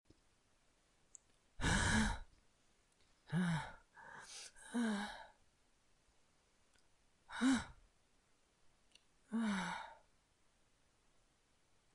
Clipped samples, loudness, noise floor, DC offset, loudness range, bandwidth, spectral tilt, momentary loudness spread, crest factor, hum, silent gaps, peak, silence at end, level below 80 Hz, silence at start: under 0.1%; -40 LUFS; -76 dBFS; under 0.1%; 7 LU; 11.5 kHz; -4.5 dB/octave; 20 LU; 22 dB; none; none; -24 dBFS; 2 s; -56 dBFS; 1.6 s